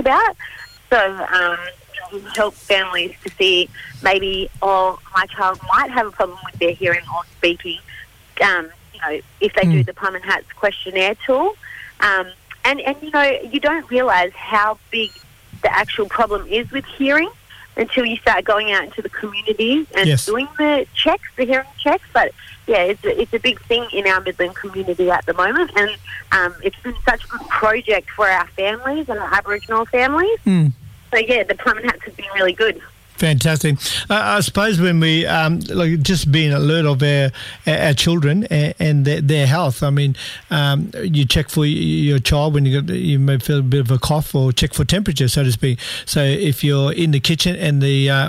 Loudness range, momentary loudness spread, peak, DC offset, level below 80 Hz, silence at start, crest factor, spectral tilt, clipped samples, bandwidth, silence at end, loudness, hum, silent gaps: 3 LU; 8 LU; -4 dBFS; under 0.1%; -40 dBFS; 0 s; 14 dB; -5 dB/octave; under 0.1%; 16 kHz; 0 s; -17 LUFS; none; none